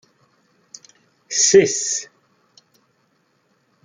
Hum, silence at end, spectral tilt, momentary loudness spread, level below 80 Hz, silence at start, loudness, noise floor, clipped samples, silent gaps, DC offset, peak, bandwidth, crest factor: none; 1.8 s; -2 dB/octave; 13 LU; -66 dBFS; 1.3 s; -16 LUFS; -64 dBFS; under 0.1%; none; under 0.1%; -2 dBFS; 9.6 kHz; 22 dB